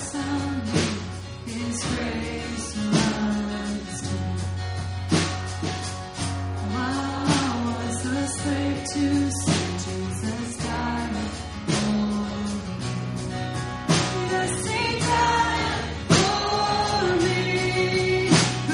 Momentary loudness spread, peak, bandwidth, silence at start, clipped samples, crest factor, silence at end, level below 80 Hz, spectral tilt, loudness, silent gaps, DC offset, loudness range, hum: 9 LU; -4 dBFS; 11.5 kHz; 0 s; under 0.1%; 20 dB; 0 s; -42 dBFS; -4.5 dB/octave; -25 LUFS; none; under 0.1%; 5 LU; none